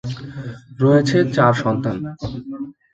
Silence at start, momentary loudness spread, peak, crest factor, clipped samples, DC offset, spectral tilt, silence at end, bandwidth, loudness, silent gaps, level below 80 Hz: 0.05 s; 17 LU; 0 dBFS; 20 dB; under 0.1%; under 0.1%; -7 dB/octave; 0.2 s; 8 kHz; -18 LUFS; none; -48 dBFS